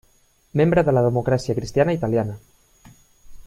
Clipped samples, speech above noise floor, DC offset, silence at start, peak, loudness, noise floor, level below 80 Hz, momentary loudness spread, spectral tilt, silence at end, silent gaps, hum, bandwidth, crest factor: under 0.1%; 40 dB; under 0.1%; 0.55 s; -4 dBFS; -21 LUFS; -59 dBFS; -46 dBFS; 10 LU; -7.5 dB/octave; 0.05 s; none; none; 14 kHz; 18 dB